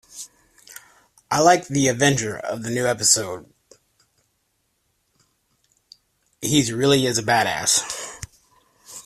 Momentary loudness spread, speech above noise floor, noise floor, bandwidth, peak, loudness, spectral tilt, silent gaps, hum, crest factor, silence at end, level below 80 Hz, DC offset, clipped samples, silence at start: 23 LU; 51 dB; -70 dBFS; 15 kHz; -2 dBFS; -19 LUFS; -3 dB/octave; none; none; 22 dB; 0.05 s; -56 dBFS; under 0.1%; under 0.1%; 0.15 s